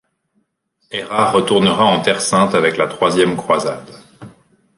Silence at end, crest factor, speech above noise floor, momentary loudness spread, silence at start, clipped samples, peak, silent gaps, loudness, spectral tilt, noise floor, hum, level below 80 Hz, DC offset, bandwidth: 0.5 s; 16 dB; 51 dB; 11 LU; 0.9 s; under 0.1%; -2 dBFS; none; -15 LUFS; -4 dB/octave; -66 dBFS; none; -54 dBFS; under 0.1%; 11.5 kHz